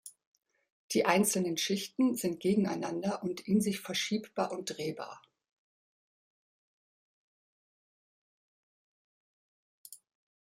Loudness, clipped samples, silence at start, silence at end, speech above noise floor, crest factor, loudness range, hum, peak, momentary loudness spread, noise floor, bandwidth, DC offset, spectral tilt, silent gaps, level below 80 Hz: -32 LUFS; under 0.1%; 0.05 s; 0.45 s; over 58 dB; 24 dB; 12 LU; none; -10 dBFS; 17 LU; under -90 dBFS; 15.5 kHz; under 0.1%; -4 dB/octave; 0.27-0.32 s, 0.72-0.89 s, 5.52-9.84 s; -76 dBFS